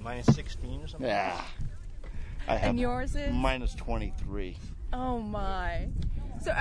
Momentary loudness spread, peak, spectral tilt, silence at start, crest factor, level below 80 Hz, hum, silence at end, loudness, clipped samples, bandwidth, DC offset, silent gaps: 14 LU; -8 dBFS; -6.5 dB/octave; 0 s; 22 dB; -34 dBFS; none; 0 s; -33 LUFS; under 0.1%; 10.5 kHz; under 0.1%; none